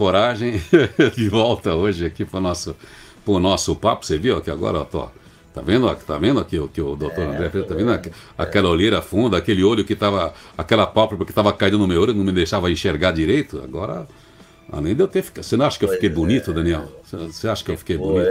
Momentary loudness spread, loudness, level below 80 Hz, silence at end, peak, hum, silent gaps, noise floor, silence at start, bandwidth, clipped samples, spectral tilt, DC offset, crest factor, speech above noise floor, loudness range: 11 LU; -20 LUFS; -40 dBFS; 0 s; 0 dBFS; none; none; -45 dBFS; 0 s; 16 kHz; under 0.1%; -6 dB/octave; under 0.1%; 18 dB; 26 dB; 4 LU